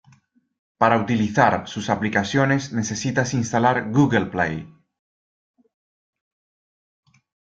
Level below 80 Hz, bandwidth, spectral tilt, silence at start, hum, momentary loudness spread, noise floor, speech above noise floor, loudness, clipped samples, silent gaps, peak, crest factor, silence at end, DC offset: -58 dBFS; 9 kHz; -5.5 dB/octave; 0.8 s; none; 7 LU; -58 dBFS; 38 dB; -21 LUFS; under 0.1%; none; -2 dBFS; 22 dB; 2.85 s; under 0.1%